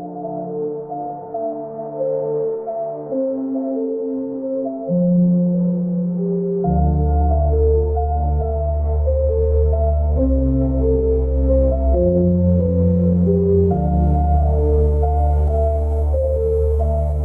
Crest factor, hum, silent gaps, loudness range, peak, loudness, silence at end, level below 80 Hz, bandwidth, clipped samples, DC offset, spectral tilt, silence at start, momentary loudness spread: 12 dB; none; none; 7 LU; -4 dBFS; -19 LUFS; 0 s; -22 dBFS; 1.5 kHz; under 0.1%; under 0.1%; -13.5 dB/octave; 0 s; 9 LU